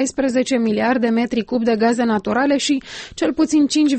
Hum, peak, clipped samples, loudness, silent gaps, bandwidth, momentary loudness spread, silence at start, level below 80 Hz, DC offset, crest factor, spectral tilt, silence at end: none; -6 dBFS; under 0.1%; -18 LUFS; none; 8.8 kHz; 5 LU; 0 s; -52 dBFS; under 0.1%; 12 dB; -4 dB/octave; 0 s